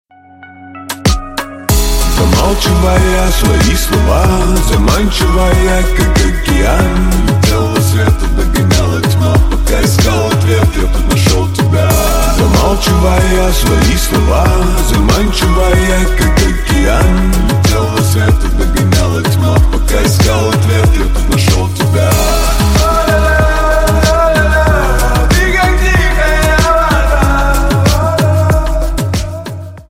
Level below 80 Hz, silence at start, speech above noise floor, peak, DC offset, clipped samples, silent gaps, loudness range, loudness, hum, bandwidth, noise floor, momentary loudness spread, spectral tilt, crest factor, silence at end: -12 dBFS; 0.4 s; 28 dB; 0 dBFS; under 0.1%; under 0.1%; none; 1 LU; -11 LUFS; none; 16.5 kHz; -37 dBFS; 3 LU; -5 dB/octave; 10 dB; 0.1 s